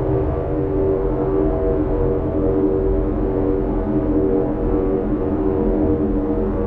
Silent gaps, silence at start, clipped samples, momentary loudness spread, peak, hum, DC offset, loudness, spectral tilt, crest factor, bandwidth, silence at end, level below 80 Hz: none; 0 s; under 0.1%; 2 LU; -6 dBFS; none; under 0.1%; -20 LUFS; -12 dB/octave; 12 dB; 3.7 kHz; 0 s; -26 dBFS